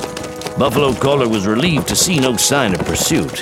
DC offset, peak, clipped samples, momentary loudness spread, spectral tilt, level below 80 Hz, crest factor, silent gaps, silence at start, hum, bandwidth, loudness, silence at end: under 0.1%; 0 dBFS; under 0.1%; 5 LU; -3.5 dB/octave; -38 dBFS; 16 dB; none; 0 s; none; 17 kHz; -15 LUFS; 0 s